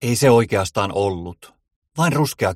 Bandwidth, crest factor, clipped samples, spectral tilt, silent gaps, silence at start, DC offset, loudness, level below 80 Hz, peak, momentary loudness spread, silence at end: 16.5 kHz; 18 dB; under 0.1%; -5.5 dB/octave; 1.76-1.82 s; 0 s; under 0.1%; -18 LUFS; -50 dBFS; -2 dBFS; 17 LU; 0 s